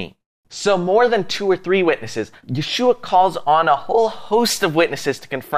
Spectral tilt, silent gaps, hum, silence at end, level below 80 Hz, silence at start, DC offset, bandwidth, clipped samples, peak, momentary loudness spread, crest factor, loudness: -4 dB/octave; 0.26-0.43 s; none; 0 s; -58 dBFS; 0 s; under 0.1%; 15.5 kHz; under 0.1%; -4 dBFS; 11 LU; 14 dB; -18 LUFS